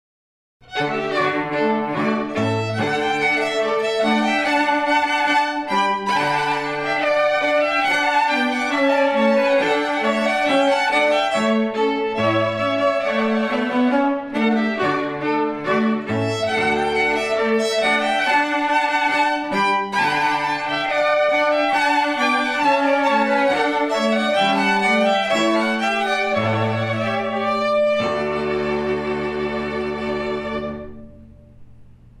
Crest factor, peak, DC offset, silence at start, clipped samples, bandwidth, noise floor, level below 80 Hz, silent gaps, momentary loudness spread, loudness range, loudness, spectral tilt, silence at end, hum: 14 dB; -6 dBFS; under 0.1%; 0.7 s; under 0.1%; 13.5 kHz; -44 dBFS; -52 dBFS; none; 5 LU; 4 LU; -19 LUFS; -4.5 dB/octave; 0.3 s; none